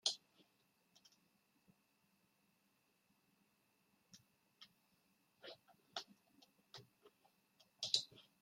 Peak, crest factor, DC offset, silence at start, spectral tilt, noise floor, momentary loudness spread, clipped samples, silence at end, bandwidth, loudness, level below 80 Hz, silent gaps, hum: -18 dBFS; 36 dB; under 0.1%; 0.05 s; 0.5 dB/octave; -80 dBFS; 27 LU; under 0.1%; 0.2 s; 16.5 kHz; -43 LUFS; under -90 dBFS; none; none